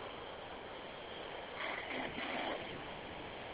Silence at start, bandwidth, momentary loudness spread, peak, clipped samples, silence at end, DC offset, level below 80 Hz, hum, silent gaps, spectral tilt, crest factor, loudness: 0 s; 4 kHz; 8 LU; -28 dBFS; under 0.1%; 0 s; under 0.1%; -64 dBFS; none; none; -1.5 dB/octave; 16 dB; -43 LUFS